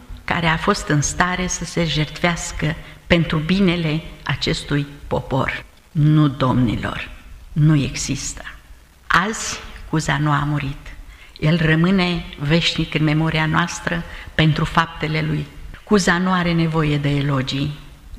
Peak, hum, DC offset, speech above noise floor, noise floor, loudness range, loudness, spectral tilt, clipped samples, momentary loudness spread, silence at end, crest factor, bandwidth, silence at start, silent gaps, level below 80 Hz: -2 dBFS; none; under 0.1%; 26 dB; -44 dBFS; 2 LU; -19 LUFS; -5 dB/octave; under 0.1%; 10 LU; 0 s; 18 dB; 13 kHz; 0 s; none; -36 dBFS